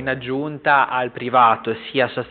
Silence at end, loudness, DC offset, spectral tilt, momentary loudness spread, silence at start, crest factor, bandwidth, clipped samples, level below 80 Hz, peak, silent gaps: 0 s; -19 LUFS; under 0.1%; -2.5 dB/octave; 9 LU; 0 s; 16 dB; 4.6 kHz; under 0.1%; -58 dBFS; -4 dBFS; none